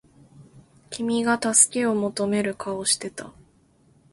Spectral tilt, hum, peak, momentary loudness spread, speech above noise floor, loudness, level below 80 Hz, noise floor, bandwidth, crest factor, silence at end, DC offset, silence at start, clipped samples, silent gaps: -2.5 dB/octave; none; 0 dBFS; 16 LU; 36 dB; -22 LUFS; -62 dBFS; -59 dBFS; 12 kHz; 24 dB; 0.85 s; under 0.1%; 0.4 s; under 0.1%; none